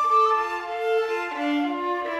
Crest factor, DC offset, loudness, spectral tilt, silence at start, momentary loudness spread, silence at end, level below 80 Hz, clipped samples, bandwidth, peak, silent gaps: 12 dB; under 0.1%; -24 LUFS; -3 dB/octave; 0 s; 8 LU; 0 s; -66 dBFS; under 0.1%; 13 kHz; -10 dBFS; none